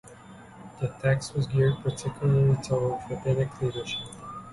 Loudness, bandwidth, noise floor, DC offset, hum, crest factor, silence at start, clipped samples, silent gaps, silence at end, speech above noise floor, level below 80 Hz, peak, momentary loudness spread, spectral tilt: -27 LUFS; 11.5 kHz; -48 dBFS; under 0.1%; none; 16 dB; 0.05 s; under 0.1%; none; 0 s; 22 dB; -52 dBFS; -12 dBFS; 18 LU; -6.5 dB/octave